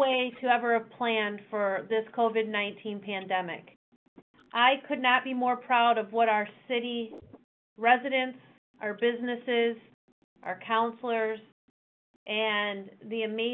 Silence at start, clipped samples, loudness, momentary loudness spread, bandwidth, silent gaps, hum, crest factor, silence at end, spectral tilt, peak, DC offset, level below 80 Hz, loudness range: 0 s; under 0.1%; -28 LUFS; 13 LU; 4.2 kHz; 3.76-4.16 s, 4.22-4.34 s, 7.44-7.76 s, 8.58-8.74 s, 9.94-10.36 s, 11.52-12.26 s; none; 20 dB; 0 s; -7 dB/octave; -10 dBFS; under 0.1%; -78 dBFS; 5 LU